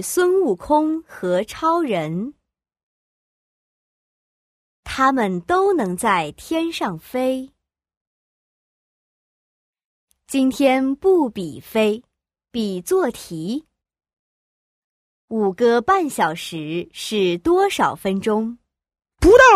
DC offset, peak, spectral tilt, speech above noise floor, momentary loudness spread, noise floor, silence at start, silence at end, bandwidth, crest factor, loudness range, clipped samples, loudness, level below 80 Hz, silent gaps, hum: under 0.1%; 0 dBFS; -5 dB/octave; over 72 dB; 11 LU; under -90 dBFS; 0 s; 0 s; 15.5 kHz; 20 dB; 8 LU; under 0.1%; -20 LUFS; -44 dBFS; 2.83-4.83 s, 7.97-9.73 s, 9.85-10.07 s, 14.19-15.28 s; none